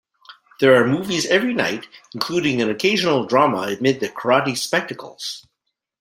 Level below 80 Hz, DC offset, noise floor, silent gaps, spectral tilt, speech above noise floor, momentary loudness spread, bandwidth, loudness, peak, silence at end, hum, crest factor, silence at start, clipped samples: -62 dBFS; under 0.1%; -48 dBFS; none; -4.5 dB/octave; 28 dB; 14 LU; 16.5 kHz; -19 LUFS; -2 dBFS; 0.6 s; none; 18 dB; 0.3 s; under 0.1%